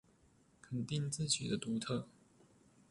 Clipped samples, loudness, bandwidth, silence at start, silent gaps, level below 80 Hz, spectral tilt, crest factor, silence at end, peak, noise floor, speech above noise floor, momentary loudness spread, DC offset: under 0.1%; -39 LUFS; 11.5 kHz; 0.65 s; none; -70 dBFS; -4 dB/octave; 22 dB; 0.8 s; -20 dBFS; -70 dBFS; 31 dB; 9 LU; under 0.1%